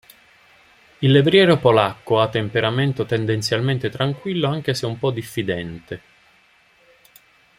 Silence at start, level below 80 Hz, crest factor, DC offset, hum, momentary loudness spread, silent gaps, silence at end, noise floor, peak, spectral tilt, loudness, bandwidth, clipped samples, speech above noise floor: 1 s; -56 dBFS; 20 dB; under 0.1%; none; 12 LU; none; 1.6 s; -56 dBFS; -2 dBFS; -6 dB/octave; -19 LUFS; 16 kHz; under 0.1%; 37 dB